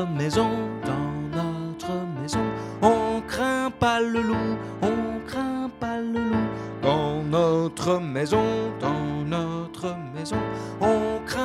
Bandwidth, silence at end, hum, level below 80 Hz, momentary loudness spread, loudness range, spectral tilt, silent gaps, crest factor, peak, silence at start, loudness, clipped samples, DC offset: 14 kHz; 0 s; none; -48 dBFS; 8 LU; 2 LU; -6 dB/octave; none; 22 dB; -4 dBFS; 0 s; -26 LUFS; under 0.1%; under 0.1%